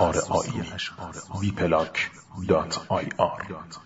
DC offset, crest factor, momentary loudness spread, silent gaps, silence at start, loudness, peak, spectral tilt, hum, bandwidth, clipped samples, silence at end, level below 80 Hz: under 0.1%; 20 dB; 12 LU; none; 0 s; -27 LUFS; -6 dBFS; -5 dB/octave; none; 8 kHz; under 0.1%; 0 s; -50 dBFS